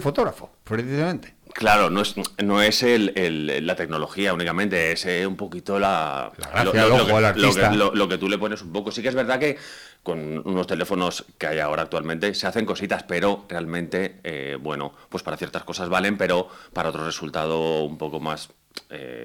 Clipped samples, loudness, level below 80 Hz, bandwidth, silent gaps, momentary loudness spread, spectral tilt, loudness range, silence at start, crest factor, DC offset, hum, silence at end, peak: under 0.1%; -23 LUFS; -52 dBFS; 19.5 kHz; none; 14 LU; -4.5 dB/octave; 7 LU; 0 s; 18 dB; under 0.1%; none; 0 s; -6 dBFS